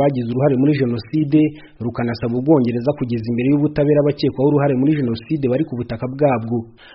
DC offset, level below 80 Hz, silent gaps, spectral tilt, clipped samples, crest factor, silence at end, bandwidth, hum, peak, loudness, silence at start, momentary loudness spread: under 0.1%; -48 dBFS; none; -8 dB/octave; under 0.1%; 14 dB; 0.25 s; 5.8 kHz; none; -2 dBFS; -18 LUFS; 0 s; 8 LU